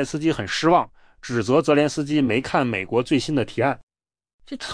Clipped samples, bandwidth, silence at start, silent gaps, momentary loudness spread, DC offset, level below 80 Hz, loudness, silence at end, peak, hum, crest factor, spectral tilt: under 0.1%; 10.5 kHz; 0 s; 3.83-3.87 s, 4.33-4.39 s; 15 LU; under 0.1%; -52 dBFS; -21 LUFS; 0 s; -6 dBFS; none; 16 dB; -5.5 dB/octave